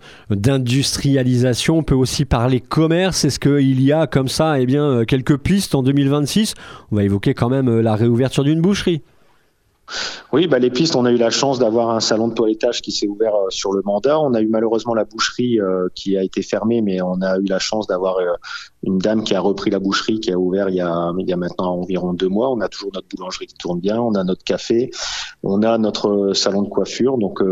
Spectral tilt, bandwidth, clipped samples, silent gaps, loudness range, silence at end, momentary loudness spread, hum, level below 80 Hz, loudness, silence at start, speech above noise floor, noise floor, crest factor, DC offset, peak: -5.5 dB/octave; 16 kHz; under 0.1%; none; 4 LU; 0 s; 7 LU; none; -42 dBFS; -18 LUFS; 0.05 s; 42 dB; -59 dBFS; 16 dB; under 0.1%; -2 dBFS